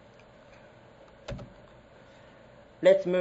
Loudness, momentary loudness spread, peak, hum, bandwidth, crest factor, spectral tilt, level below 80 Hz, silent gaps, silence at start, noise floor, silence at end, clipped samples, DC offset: -24 LUFS; 25 LU; -8 dBFS; none; 8 kHz; 22 dB; -6.5 dB/octave; -58 dBFS; none; 1.3 s; -54 dBFS; 0 s; under 0.1%; under 0.1%